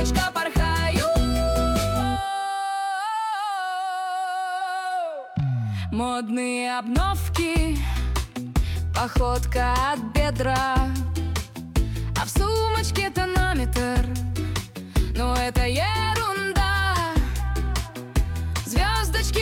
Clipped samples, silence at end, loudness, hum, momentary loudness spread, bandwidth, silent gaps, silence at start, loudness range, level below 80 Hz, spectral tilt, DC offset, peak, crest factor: under 0.1%; 0 s; -25 LUFS; none; 5 LU; 17.5 kHz; none; 0 s; 3 LU; -28 dBFS; -5 dB/octave; under 0.1%; -10 dBFS; 12 dB